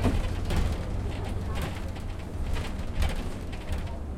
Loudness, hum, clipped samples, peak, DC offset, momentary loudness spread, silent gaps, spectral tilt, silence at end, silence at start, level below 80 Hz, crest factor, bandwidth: -33 LUFS; none; under 0.1%; -14 dBFS; under 0.1%; 7 LU; none; -6 dB/octave; 0 s; 0 s; -32 dBFS; 16 dB; 15.5 kHz